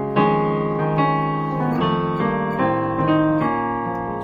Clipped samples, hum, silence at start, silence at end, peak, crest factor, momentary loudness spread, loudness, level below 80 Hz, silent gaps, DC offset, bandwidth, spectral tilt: under 0.1%; none; 0 s; 0 s; -6 dBFS; 14 dB; 4 LU; -20 LUFS; -46 dBFS; none; under 0.1%; 5.4 kHz; -9.5 dB/octave